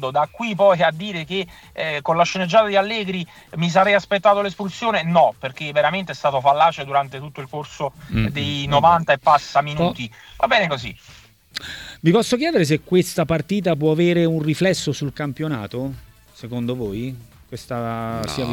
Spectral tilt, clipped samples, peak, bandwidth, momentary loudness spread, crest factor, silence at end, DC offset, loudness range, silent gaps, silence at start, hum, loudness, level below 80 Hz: -5.5 dB/octave; under 0.1%; -2 dBFS; 17.5 kHz; 15 LU; 18 dB; 0 s; under 0.1%; 4 LU; none; 0 s; none; -20 LUFS; -48 dBFS